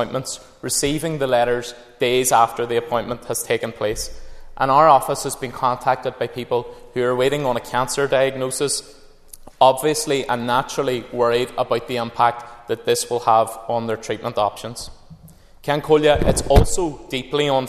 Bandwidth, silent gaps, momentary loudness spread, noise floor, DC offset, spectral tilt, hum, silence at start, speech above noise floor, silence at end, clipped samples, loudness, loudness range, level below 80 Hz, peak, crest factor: 14 kHz; none; 11 LU; -45 dBFS; under 0.1%; -4 dB/octave; none; 0 s; 26 dB; 0 s; under 0.1%; -20 LUFS; 2 LU; -34 dBFS; 0 dBFS; 20 dB